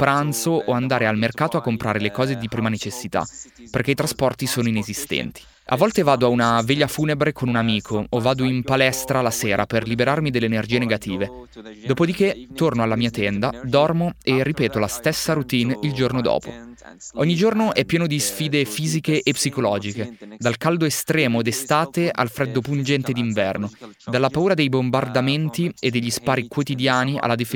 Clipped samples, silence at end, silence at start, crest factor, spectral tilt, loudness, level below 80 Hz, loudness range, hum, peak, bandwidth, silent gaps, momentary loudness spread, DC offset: under 0.1%; 0 s; 0 s; 20 dB; -5 dB/octave; -21 LUFS; -50 dBFS; 2 LU; none; -2 dBFS; 18 kHz; none; 7 LU; under 0.1%